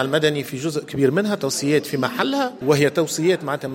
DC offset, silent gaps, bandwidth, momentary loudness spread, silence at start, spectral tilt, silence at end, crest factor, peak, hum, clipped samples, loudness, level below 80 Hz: under 0.1%; none; 17 kHz; 7 LU; 0 s; -4.5 dB/octave; 0 s; 18 dB; -4 dBFS; none; under 0.1%; -21 LUFS; -62 dBFS